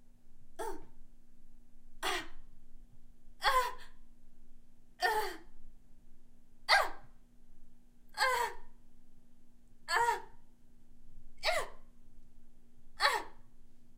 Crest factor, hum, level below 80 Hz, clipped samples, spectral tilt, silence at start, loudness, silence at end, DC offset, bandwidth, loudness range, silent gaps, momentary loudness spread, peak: 26 dB; none; -52 dBFS; under 0.1%; -1 dB/octave; 0 s; -34 LUFS; 0 s; under 0.1%; 16 kHz; 4 LU; none; 23 LU; -12 dBFS